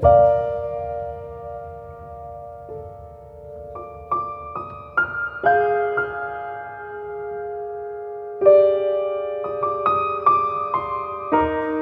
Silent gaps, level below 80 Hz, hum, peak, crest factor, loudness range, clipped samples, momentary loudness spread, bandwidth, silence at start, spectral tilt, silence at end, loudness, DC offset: none; -44 dBFS; none; -2 dBFS; 18 dB; 13 LU; under 0.1%; 19 LU; 5 kHz; 0 s; -9 dB/octave; 0 s; -21 LUFS; under 0.1%